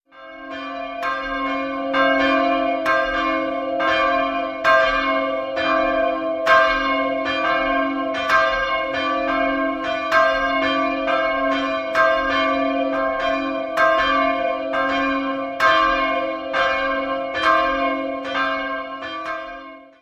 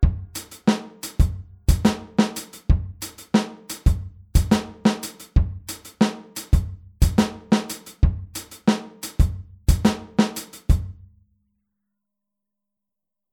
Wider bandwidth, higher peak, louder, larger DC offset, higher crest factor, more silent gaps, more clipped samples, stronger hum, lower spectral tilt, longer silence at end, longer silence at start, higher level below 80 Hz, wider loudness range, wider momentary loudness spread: second, 8.8 kHz vs 19.5 kHz; about the same, -2 dBFS vs -4 dBFS; first, -20 LUFS vs -23 LUFS; neither; about the same, 18 dB vs 20 dB; neither; neither; neither; second, -4 dB/octave vs -6 dB/octave; second, 0.15 s vs 2.4 s; first, 0.15 s vs 0 s; second, -46 dBFS vs -26 dBFS; about the same, 2 LU vs 2 LU; second, 8 LU vs 13 LU